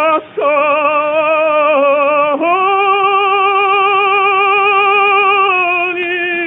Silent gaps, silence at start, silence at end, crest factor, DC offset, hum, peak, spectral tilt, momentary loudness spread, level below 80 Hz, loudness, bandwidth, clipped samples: none; 0 s; 0 s; 10 dB; under 0.1%; none; -2 dBFS; -5.5 dB/octave; 5 LU; -68 dBFS; -11 LUFS; 3.9 kHz; under 0.1%